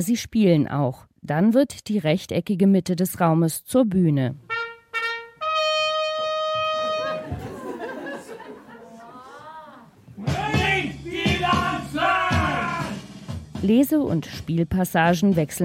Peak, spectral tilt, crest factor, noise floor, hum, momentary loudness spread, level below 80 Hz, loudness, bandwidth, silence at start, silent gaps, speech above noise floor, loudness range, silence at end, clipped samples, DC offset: -6 dBFS; -5.5 dB/octave; 16 dB; -46 dBFS; none; 17 LU; -46 dBFS; -22 LUFS; 16.5 kHz; 0 s; none; 26 dB; 8 LU; 0 s; under 0.1%; under 0.1%